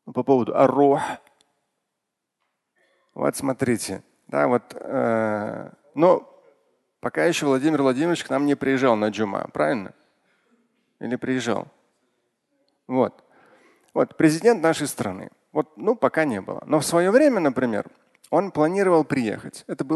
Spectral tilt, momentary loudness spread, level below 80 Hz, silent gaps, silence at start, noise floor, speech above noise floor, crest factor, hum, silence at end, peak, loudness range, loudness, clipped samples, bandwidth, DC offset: -5.5 dB/octave; 13 LU; -64 dBFS; none; 0.05 s; -81 dBFS; 60 dB; 20 dB; none; 0 s; -2 dBFS; 8 LU; -22 LUFS; under 0.1%; 12.5 kHz; under 0.1%